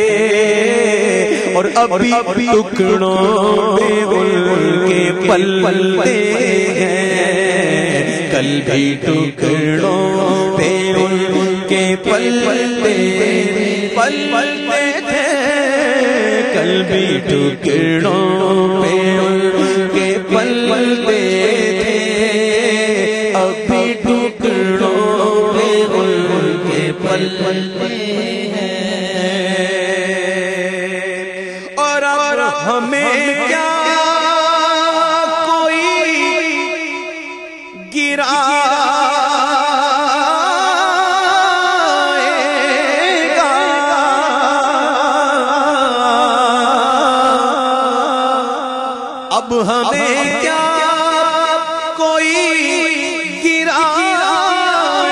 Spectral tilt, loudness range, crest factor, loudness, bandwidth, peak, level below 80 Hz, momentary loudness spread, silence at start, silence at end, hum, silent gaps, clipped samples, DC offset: -4 dB/octave; 3 LU; 14 dB; -13 LUFS; 11.5 kHz; 0 dBFS; -52 dBFS; 5 LU; 0 s; 0 s; none; none; under 0.1%; under 0.1%